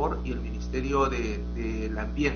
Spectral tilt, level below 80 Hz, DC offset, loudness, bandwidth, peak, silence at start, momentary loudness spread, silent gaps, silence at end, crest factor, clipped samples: -6 dB/octave; -34 dBFS; under 0.1%; -30 LUFS; 6.8 kHz; -12 dBFS; 0 s; 7 LU; none; 0 s; 16 dB; under 0.1%